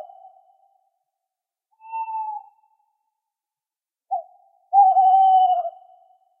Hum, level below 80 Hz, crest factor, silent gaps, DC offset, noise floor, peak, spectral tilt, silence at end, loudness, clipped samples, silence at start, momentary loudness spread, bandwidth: none; under -90 dBFS; 16 dB; none; under 0.1%; under -90 dBFS; -6 dBFS; -0.5 dB/octave; 0.7 s; -18 LUFS; under 0.1%; 0 s; 18 LU; 3.3 kHz